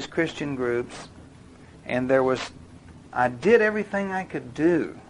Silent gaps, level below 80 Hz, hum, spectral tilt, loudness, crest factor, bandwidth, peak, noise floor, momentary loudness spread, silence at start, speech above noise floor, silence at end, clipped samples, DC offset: none; -54 dBFS; none; -6 dB/octave; -24 LUFS; 20 dB; 11 kHz; -6 dBFS; -48 dBFS; 17 LU; 0 s; 24 dB; 0.05 s; under 0.1%; under 0.1%